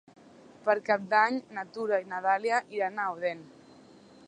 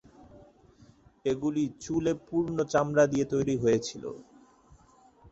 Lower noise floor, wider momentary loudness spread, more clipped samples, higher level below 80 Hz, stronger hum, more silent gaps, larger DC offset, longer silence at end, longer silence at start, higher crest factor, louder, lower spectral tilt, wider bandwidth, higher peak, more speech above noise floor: second, -54 dBFS vs -59 dBFS; about the same, 10 LU vs 12 LU; neither; second, -80 dBFS vs -60 dBFS; neither; neither; neither; first, 0.8 s vs 0.05 s; first, 0.65 s vs 0.35 s; about the same, 20 dB vs 20 dB; about the same, -29 LUFS vs -28 LUFS; second, -4.5 dB/octave vs -6 dB/octave; first, 10 kHz vs 8.2 kHz; about the same, -10 dBFS vs -10 dBFS; second, 26 dB vs 32 dB